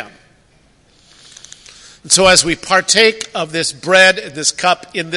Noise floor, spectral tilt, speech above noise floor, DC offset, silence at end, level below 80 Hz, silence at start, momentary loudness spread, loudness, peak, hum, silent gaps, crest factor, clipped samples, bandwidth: -52 dBFS; -1.5 dB/octave; 39 dB; under 0.1%; 0 s; -48 dBFS; 0 s; 10 LU; -12 LUFS; 0 dBFS; none; none; 16 dB; 0.1%; 16 kHz